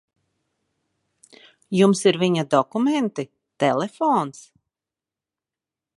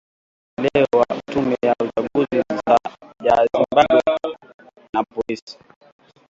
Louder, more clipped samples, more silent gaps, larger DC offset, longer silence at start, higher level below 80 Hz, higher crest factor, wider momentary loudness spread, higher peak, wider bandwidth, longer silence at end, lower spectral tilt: about the same, -21 LUFS vs -19 LUFS; neither; second, none vs 4.54-4.59 s, 4.89-4.93 s, 5.42-5.47 s; neither; first, 1.7 s vs 0.6 s; second, -72 dBFS vs -54 dBFS; about the same, 20 dB vs 20 dB; about the same, 11 LU vs 12 LU; about the same, -4 dBFS vs -2 dBFS; first, 11.5 kHz vs 7.8 kHz; first, 1.55 s vs 0.75 s; about the same, -5.5 dB/octave vs -6 dB/octave